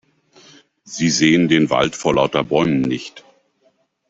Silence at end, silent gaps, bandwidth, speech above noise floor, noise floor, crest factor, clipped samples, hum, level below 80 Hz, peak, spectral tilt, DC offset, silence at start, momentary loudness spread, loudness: 0.9 s; none; 8 kHz; 45 dB; -62 dBFS; 18 dB; under 0.1%; none; -52 dBFS; -2 dBFS; -4.5 dB/octave; under 0.1%; 0.85 s; 11 LU; -17 LUFS